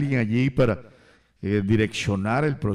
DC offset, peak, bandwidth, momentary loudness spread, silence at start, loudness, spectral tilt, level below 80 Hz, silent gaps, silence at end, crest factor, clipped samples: under 0.1%; -10 dBFS; 11.5 kHz; 5 LU; 0 s; -23 LUFS; -7 dB/octave; -46 dBFS; none; 0 s; 12 dB; under 0.1%